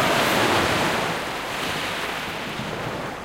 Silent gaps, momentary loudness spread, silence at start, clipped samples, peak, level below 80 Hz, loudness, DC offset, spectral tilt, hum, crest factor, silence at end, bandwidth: none; 10 LU; 0 s; under 0.1%; -8 dBFS; -48 dBFS; -23 LUFS; under 0.1%; -3.5 dB/octave; none; 16 dB; 0 s; 16 kHz